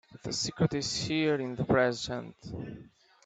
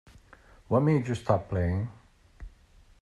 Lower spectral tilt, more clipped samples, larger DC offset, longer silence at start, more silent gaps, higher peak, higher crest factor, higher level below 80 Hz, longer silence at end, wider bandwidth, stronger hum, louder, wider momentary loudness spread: second, -4.5 dB/octave vs -8.5 dB/octave; neither; neither; second, 0.1 s vs 0.7 s; neither; about the same, -12 dBFS vs -10 dBFS; about the same, 20 dB vs 20 dB; second, -58 dBFS vs -52 dBFS; second, 0.4 s vs 0.55 s; second, 9.2 kHz vs 11.5 kHz; neither; about the same, -30 LUFS vs -28 LUFS; first, 15 LU vs 8 LU